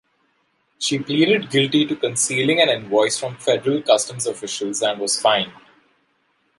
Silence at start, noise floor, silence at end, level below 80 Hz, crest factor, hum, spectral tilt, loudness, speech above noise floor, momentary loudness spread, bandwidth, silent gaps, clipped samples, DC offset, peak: 0.8 s; -66 dBFS; 1.05 s; -68 dBFS; 20 dB; none; -3 dB/octave; -19 LUFS; 46 dB; 8 LU; 11.5 kHz; none; under 0.1%; under 0.1%; -2 dBFS